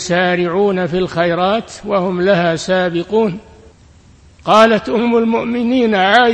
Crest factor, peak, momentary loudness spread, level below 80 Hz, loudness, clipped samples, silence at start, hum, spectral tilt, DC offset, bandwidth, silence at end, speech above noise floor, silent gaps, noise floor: 14 dB; 0 dBFS; 7 LU; -46 dBFS; -14 LUFS; 0.2%; 0 s; none; -5.5 dB/octave; under 0.1%; 11 kHz; 0 s; 31 dB; none; -45 dBFS